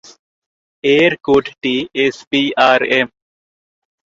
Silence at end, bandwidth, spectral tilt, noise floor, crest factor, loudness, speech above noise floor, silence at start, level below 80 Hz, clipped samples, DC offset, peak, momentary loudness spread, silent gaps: 1 s; 7.6 kHz; -5 dB/octave; under -90 dBFS; 16 dB; -15 LUFS; over 76 dB; 0.85 s; -54 dBFS; under 0.1%; under 0.1%; 0 dBFS; 7 LU; 2.27-2.31 s